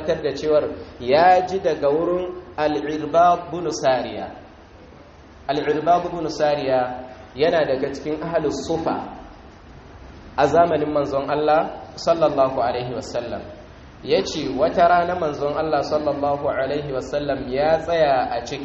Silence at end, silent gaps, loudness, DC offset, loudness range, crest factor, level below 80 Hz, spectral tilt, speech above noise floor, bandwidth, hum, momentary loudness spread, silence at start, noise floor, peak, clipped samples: 0 s; none; -21 LUFS; under 0.1%; 4 LU; 18 dB; -48 dBFS; -4 dB/octave; 24 dB; 7.6 kHz; none; 13 LU; 0 s; -44 dBFS; -4 dBFS; under 0.1%